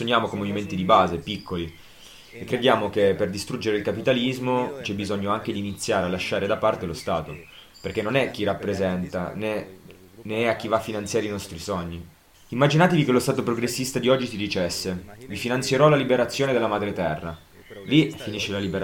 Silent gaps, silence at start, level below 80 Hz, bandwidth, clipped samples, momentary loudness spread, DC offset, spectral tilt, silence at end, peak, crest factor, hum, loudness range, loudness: none; 0 s; -52 dBFS; 17 kHz; under 0.1%; 13 LU; under 0.1%; -5 dB/octave; 0 s; -4 dBFS; 22 dB; none; 5 LU; -24 LUFS